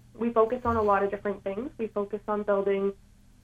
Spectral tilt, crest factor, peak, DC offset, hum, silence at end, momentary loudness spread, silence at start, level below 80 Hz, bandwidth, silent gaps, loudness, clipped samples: -8 dB/octave; 18 dB; -10 dBFS; under 0.1%; none; 0.5 s; 8 LU; 0.15 s; -54 dBFS; 7.6 kHz; none; -28 LUFS; under 0.1%